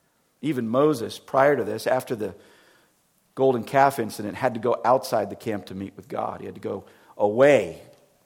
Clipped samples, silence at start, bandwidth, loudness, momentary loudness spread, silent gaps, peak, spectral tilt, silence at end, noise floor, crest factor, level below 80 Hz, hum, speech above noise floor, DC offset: under 0.1%; 0.4 s; 18 kHz; -24 LUFS; 15 LU; none; -4 dBFS; -6 dB/octave; 0.45 s; -65 dBFS; 20 dB; -68 dBFS; none; 42 dB; under 0.1%